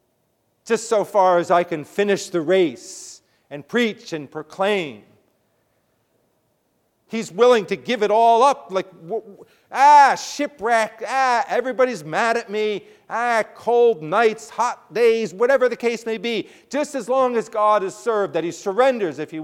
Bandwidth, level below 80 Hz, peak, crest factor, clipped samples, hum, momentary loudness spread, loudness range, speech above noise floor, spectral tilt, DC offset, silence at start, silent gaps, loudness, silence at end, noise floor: 15 kHz; -72 dBFS; -2 dBFS; 18 dB; under 0.1%; none; 14 LU; 9 LU; 48 dB; -4 dB/octave; under 0.1%; 0.65 s; none; -19 LUFS; 0 s; -68 dBFS